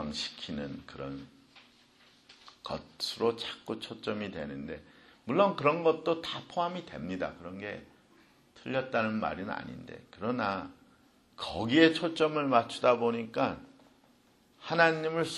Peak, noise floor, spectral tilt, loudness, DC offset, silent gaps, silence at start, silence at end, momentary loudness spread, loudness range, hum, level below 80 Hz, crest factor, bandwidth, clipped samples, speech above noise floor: -8 dBFS; -65 dBFS; -5 dB/octave; -31 LUFS; under 0.1%; none; 0 s; 0 s; 18 LU; 9 LU; none; -64 dBFS; 24 dB; 12.5 kHz; under 0.1%; 33 dB